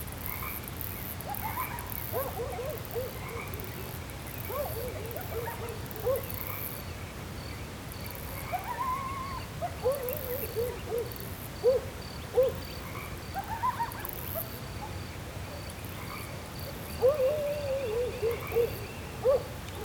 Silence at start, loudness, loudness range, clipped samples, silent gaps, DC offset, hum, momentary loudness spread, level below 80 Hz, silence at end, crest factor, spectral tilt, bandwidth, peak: 0 s; -34 LUFS; 5 LU; under 0.1%; none; under 0.1%; none; 11 LU; -48 dBFS; 0 s; 20 dB; -5 dB/octave; over 20 kHz; -14 dBFS